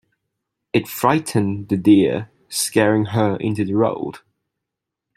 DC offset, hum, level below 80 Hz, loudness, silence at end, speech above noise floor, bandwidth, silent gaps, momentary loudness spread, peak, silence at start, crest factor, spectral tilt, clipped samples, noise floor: under 0.1%; none; -58 dBFS; -19 LUFS; 1 s; 65 dB; 16 kHz; none; 10 LU; -2 dBFS; 0.75 s; 18 dB; -5.5 dB/octave; under 0.1%; -83 dBFS